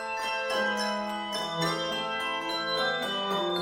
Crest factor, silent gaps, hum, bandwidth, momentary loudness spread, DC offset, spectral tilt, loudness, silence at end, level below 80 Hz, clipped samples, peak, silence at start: 14 dB; none; none; 16.5 kHz; 4 LU; under 0.1%; -3 dB/octave; -29 LUFS; 0 s; -64 dBFS; under 0.1%; -16 dBFS; 0 s